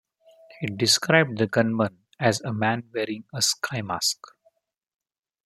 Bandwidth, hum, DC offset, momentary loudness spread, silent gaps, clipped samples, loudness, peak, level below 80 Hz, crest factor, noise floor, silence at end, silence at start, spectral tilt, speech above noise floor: 16 kHz; none; under 0.1%; 10 LU; none; under 0.1%; -24 LUFS; -2 dBFS; -68 dBFS; 24 dB; -66 dBFS; 1.3 s; 0.6 s; -3.5 dB/octave; 42 dB